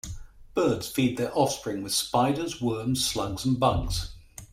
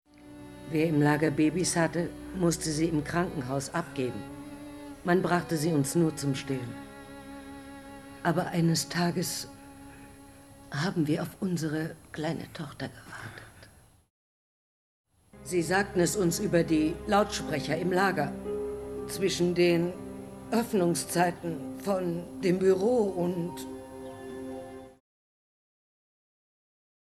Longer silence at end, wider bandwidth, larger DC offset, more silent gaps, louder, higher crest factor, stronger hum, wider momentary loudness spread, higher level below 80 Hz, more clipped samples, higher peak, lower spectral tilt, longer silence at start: second, 0.05 s vs 2.25 s; first, 16 kHz vs 13 kHz; neither; second, none vs 14.10-15.04 s; about the same, -27 LUFS vs -29 LUFS; about the same, 18 dB vs 18 dB; neither; second, 9 LU vs 19 LU; first, -42 dBFS vs -56 dBFS; neither; first, -8 dBFS vs -12 dBFS; about the same, -4.5 dB/octave vs -5 dB/octave; second, 0.05 s vs 0.2 s